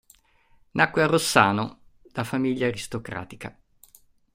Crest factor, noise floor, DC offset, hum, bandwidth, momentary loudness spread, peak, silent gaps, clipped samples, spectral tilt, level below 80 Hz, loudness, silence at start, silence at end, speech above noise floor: 24 dB; -60 dBFS; under 0.1%; none; 16 kHz; 17 LU; -2 dBFS; none; under 0.1%; -4.5 dB/octave; -58 dBFS; -24 LUFS; 0.75 s; 0.85 s; 36 dB